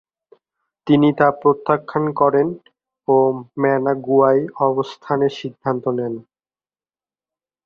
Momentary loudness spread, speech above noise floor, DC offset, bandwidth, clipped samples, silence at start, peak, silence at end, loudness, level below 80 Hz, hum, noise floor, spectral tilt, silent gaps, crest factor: 10 LU; over 73 dB; under 0.1%; 6.8 kHz; under 0.1%; 0.85 s; -2 dBFS; 1.45 s; -18 LUFS; -62 dBFS; none; under -90 dBFS; -8.5 dB/octave; none; 18 dB